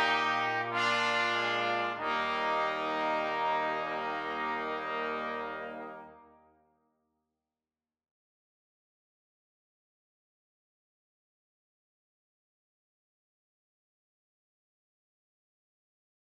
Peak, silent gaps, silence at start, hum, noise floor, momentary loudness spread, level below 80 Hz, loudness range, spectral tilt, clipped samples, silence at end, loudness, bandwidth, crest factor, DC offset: -18 dBFS; none; 0 s; none; under -90 dBFS; 10 LU; -74 dBFS; 13 LU; -3.5 dB/octave; under 0.1%; 10 s; -31 LUFS; 14 kHz; 18 dB; under 0.1%